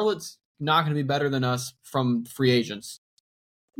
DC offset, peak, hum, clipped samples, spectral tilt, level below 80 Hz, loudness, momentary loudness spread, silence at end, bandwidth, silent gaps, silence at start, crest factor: under 0.1%; -8 dBFS; none; under 0.1%; -5.5 dB/octave; -66 dBFS; -25 LUFS; 15 LU; 0.85 s; 17 kHz; 0.45-0.55 s; 0 s; 18 dB